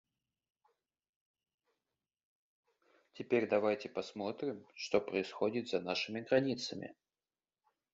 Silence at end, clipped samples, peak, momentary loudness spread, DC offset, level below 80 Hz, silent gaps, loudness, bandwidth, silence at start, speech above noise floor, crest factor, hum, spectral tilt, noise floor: 1 s; under 0.1%; -16 dBFS; 10 LU; under 0.1%; -80 dBFS; none; -36 LUFS; 7.6 kHz; 3.15 s; over 54 dB; 22 dB; none; -3.5 dB/octave; under -90 dBFS